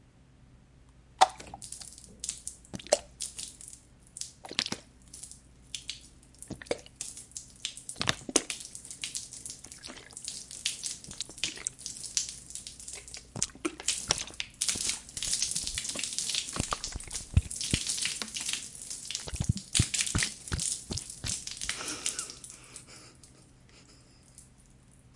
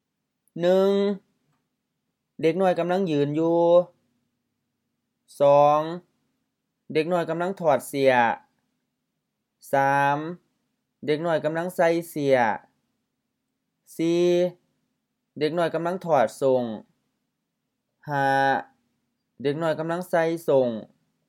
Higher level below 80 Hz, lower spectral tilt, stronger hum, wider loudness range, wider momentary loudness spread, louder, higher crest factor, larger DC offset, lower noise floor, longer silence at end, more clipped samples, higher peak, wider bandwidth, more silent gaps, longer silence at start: first, -50 dBFS vs -80 dBFS; second, -2 dB/octave vs -6 dB/octave; neither; first, 8 LU vs 4 LU; first, 17 LU vs 12 LU; second, -33 LUFS vs -23 LUFS; first, 32 dB vs 20 dB; neither; second, -58 dBFS vs -80 dBFS; second, 0 s vs 0.45 s; neither; about the same, -4 dBFS vs -6 dBFS; second, 11.5 kHz vs 16.5 kHz; neither; second, 0.2 s vs 0.55 s